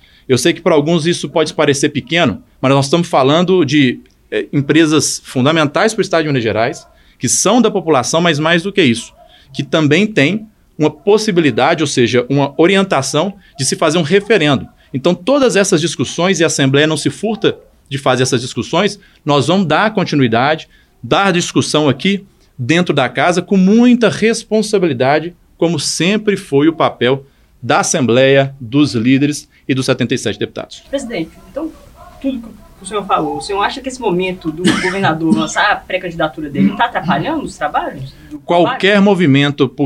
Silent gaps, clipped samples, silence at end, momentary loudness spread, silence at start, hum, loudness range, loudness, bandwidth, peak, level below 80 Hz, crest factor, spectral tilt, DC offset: none; under 0.1%; 0 s; 11 LU; 0.3 s; none; 4 LU; -14 LUFS; 13 kHz; 0 dBFS; -48 dBFS; 14 dB; -4.5 dB/octave; under 0.1%